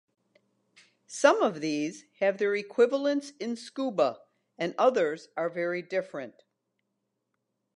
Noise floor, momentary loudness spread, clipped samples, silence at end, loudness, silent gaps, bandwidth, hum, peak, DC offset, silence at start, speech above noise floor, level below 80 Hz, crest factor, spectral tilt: -81 dBFS; 12 LU; under 0.1%; 1.45 s; -28 LUFS; none; 11 kHz; none; -6 dBFS; under 0.1%; 1.1 s; 53 dB; -86 dBFS; 24 dB; -4.5 dB/octave